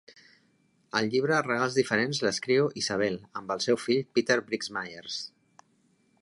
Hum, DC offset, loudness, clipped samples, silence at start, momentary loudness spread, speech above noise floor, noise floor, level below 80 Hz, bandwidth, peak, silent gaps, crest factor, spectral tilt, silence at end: none; under 0.1%; -28 LUFS; under 0.1%; 0.95 s; 10 LU; 40 dB; -68 dBFS; -70 dBFS; 11.5 kHz; -10 dBFS; none; 20 dB; -4 dB/octave; 0.95 s